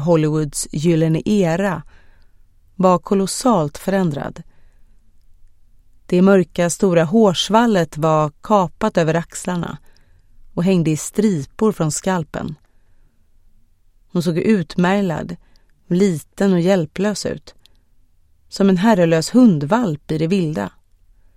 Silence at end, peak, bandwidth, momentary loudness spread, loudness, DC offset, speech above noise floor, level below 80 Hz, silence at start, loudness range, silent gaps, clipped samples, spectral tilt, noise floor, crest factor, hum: 0.7 s; 0 dBFS; 15 kHz; 12 LU; -17 LUFS; under 0.1%; 36 dB; -46 dBFS; 0 s; 6 LU; none; under 0.1%; -6 dB/octave; -53 dBFS; 18 dB; none